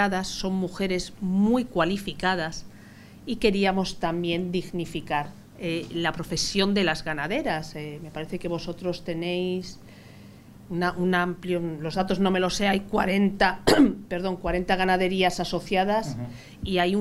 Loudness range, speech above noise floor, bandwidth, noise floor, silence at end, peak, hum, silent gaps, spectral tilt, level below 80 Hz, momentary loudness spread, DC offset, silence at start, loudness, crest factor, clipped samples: 6 LU; 22 dB; 15 kHz; -47 dBFS; 0 s; -4 dBFS; none; none; -5 dB/octave; -46 dBFS; 12 LU; under 0.1%; 0 s; -26 LUFS; 22 dB; under 0.1%